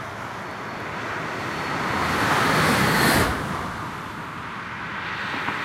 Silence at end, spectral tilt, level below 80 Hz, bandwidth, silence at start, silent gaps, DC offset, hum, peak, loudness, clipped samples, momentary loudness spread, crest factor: 0 s; -4 dB/octave; -44 dBFS; 16 kHz; 0 s; none; under 0.1%; none; -6 dBFS; -24 LUFS; under 0.1%; 14 LU; 20 dB